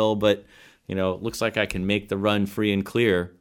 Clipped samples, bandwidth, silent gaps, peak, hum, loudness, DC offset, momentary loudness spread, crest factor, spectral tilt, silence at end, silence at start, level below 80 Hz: under 0.1%; 18.5 kHz; none; -6 dBFS; none; -24 LUFS; under 0.1%; 5 LU; 18 dB; -5.5 dB/octave; 0.1 s; 0 s; -50 dBFS